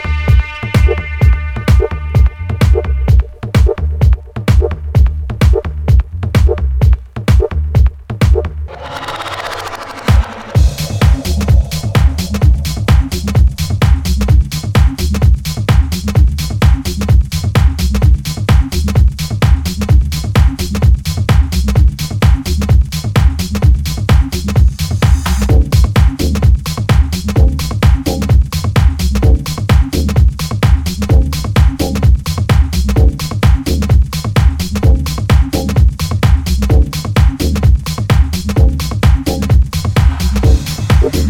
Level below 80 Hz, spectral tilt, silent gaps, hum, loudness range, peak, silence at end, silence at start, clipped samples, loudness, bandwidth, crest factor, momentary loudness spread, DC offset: -14 dBFS; -6 dB/octave; none; none; 1 LU; 0 dBFS; 0 s; 0 s; under 0.1%; -13 LUFS; 16 kHz; 10 dB; 3 LU; under 0.1%